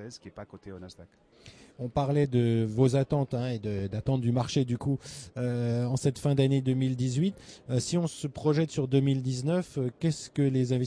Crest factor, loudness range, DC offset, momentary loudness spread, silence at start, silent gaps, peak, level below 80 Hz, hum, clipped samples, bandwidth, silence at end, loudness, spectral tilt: 16 dB; 2 LU; under 0.1%; 16 LU; 0 s; none; -12 dBFS; -56 dBFS; none; under 0.1%; 11 kHz; 0 s; -29 LUFS; -7 dB/octave